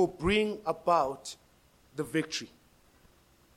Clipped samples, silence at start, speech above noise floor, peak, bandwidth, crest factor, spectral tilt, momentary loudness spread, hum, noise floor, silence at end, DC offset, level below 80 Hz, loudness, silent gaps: under 0.1%; 0 s; 33 dB; -12 dBFS; 16.5 kHz; 20 dB; -4.5 dB/octave; 18 LU; none; -63 dBFS; 1.1 s; under 0.1%; -54 dBFS; -31 LUFS; none